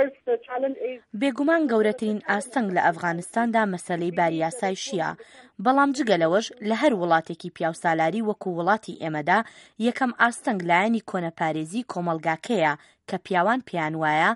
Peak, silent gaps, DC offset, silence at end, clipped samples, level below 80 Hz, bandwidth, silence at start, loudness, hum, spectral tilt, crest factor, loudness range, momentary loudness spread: -6 dBFS; none; under 0.1%; 0 s; under 0.1%; -72 dBFS; 11.5 kHz; 0 s; -24 LUFS; none; -5 dB/octave; 18 dB; 2 LU; 8 LU